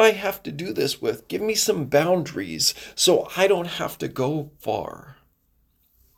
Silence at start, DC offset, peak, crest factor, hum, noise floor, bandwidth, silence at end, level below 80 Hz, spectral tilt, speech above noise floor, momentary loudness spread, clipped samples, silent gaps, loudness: 0 s; under 0.1%; -4 dBFS; 20 dB; none; -65 dBFS; 17 kHz; 1.05 s; -58 dBFS; -3.5 dB/octave; 42 dB; 10 LU; under 0.1%; none; -23 LUFS